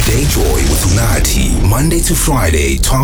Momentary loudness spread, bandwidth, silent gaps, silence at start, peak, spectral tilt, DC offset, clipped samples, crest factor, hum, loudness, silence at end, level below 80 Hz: 1 LU; over 20 kHz; none; 0 s; -2 dBFS; -4.5 dB/octave; under 0.1%; under 0.1%; 8 dB; none; -12 LUFS; 0 s; -14 dBFS